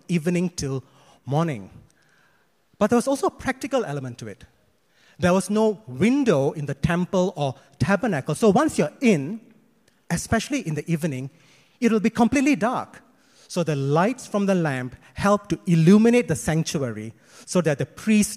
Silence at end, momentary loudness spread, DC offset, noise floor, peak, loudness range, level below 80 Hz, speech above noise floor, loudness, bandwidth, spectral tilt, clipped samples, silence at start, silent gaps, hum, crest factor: 0 s; 12 LU; under 0.1%; -64 dBFS; -4 dBFS; 5 LU; -50 dBFS; 42 dB; -23 LUFS; 15 kHz; -6 dB/octave; under 0.1%; 0.1 s; none; none; 18 dB